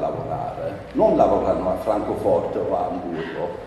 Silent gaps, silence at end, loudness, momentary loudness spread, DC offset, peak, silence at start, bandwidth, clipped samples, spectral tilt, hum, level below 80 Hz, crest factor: none; 0 s; -22 LUFS; 11 LU; under 0.1%; -2 dBFS; 0 s; 12.5 kHz; under 0.1%; -8 dB/octave; none; -44 dBFS; 20 dB